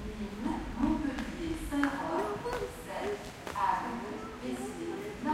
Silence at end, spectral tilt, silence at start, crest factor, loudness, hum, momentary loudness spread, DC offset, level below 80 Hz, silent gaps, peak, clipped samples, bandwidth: 0 s; -5.5 dB/octave; 0 s; 22 dB; -35 LUFS; none; 8 LU; under 0.1%; -48 dBFS; none; -12 dBFS; under 0.1%; 16 kHz